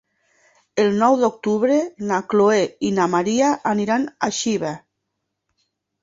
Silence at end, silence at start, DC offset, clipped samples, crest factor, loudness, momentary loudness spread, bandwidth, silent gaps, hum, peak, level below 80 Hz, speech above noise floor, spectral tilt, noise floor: 1.25 s; 0.75 s; under 0.1%; under 0.1%; 18 dB; -20 LUFS; 7 LU; 7.8 kHz; none; none; -4 dBFS; -62 dBFS; 59 dB; -5 dB/octave; -78 dBFS